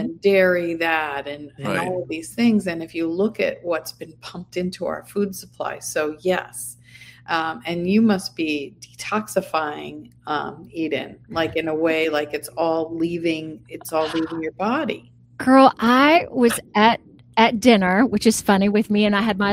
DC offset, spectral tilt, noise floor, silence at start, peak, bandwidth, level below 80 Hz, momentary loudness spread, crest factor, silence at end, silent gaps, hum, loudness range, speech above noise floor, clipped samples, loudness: under 0.1%; -5 dB/octave; -46 dBFS; 0 s; 0 dBFS; 16 kHz; -56 dBFS; 14 LU; 20 dB; 0 s; none; none; 9 LU; 25 dB; under 0.1%; -21 LUFS